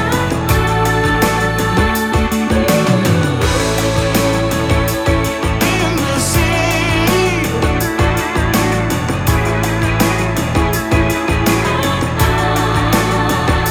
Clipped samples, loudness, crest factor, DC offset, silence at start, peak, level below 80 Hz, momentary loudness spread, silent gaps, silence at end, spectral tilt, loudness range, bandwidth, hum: under 0.1%; -14 LUFS; 14 dB; under 0.1%; 0 s; 0 dBFS; -24 dBFS; 2 LU; none; 0 s; -5 dB/octave; 1 LU; 17.5 kHz; none